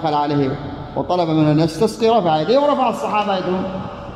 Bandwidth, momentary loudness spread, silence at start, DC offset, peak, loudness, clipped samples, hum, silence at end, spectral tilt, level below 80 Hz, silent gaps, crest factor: 13.5 kHz; 11 LU; 0 s; under 0.1%; -4 dBFS; -18 LUFS; under 0.1%; none; 0 s; -7 dB/octave; -46 dBFS; none; 14 dB